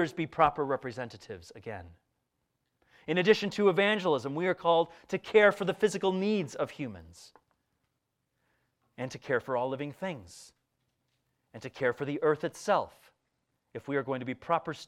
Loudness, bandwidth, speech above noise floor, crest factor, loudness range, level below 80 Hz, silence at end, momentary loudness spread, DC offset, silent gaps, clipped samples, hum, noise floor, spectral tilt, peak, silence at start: -29 LUFS; 13.5 kHz; 51 dB; 22 dB; 10 LU; -68 dBFS; 0 s; 19 LU; under 0.1%; none; under 0.1%; none; -82 dBFS; -5.5 dB/octave; -10 dBFS; 0 s